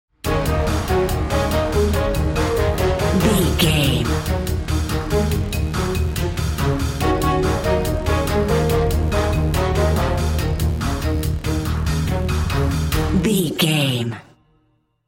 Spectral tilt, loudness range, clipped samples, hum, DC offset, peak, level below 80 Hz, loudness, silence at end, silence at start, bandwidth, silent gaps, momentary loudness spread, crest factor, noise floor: -5.5 dB/octave; 2 LU; under 0.1%; none; under 0.1%; -4 dBFS; -24 dBFS; -20 LUFS; 0.85 s; 0.25 s; 17 kHz; none; 5 LU; 16 dB; -63 dBFS